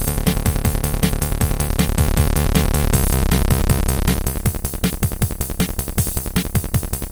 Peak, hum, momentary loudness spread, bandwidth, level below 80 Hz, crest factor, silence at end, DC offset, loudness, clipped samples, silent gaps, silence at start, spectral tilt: -2 dBFS; none; 4 LU; over 20 kHz; -22 dBFS; 16 dB; 0 s; under 0.1%; -20 LUFS; under 0.1%; none; 0 s; -5 dB/octave